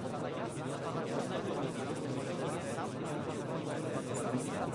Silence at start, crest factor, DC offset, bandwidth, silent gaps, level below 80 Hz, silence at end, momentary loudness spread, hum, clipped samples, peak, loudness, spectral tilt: 0 s; 14 dB; under 0.1%; 11.5 kHz; none; -68 dBFS; 0 s; 3 LU; none; under 0.1%; -22 dBFS; -38 LUFS; -5.5 dB/octave